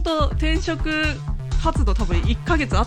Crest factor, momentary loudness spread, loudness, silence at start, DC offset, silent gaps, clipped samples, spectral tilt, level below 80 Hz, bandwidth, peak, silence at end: 14 dB; 3 LU; -22 LUFS; 0 s; under 0.1%; none; under 0.1%; -6 dB/octave; -22 dBFS; 9.8 kHz; -6 dBFS; 0 s